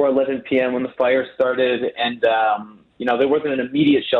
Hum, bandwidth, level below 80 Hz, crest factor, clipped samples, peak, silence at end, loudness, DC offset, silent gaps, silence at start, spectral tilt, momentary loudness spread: none; 4.4 kHz; -60 dBFS; 12 dB; under 0.1%; -6 dBFS; 0 s; -19 LUFS; under 0.1%; none; 0 s; -7.5 dB/octave; 5 LU